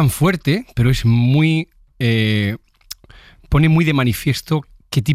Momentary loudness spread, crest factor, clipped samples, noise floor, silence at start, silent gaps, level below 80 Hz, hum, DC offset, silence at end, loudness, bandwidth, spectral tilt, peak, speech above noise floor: 18 LU; 14 dB; under 0.1%; -45 dBFS; 0 s; none; -34 dBFS; none; under 0.1%; 0 s; -17 LUFS; 15.5 kHz; -6.5 dB/octave; -4 dBFS; 30 dB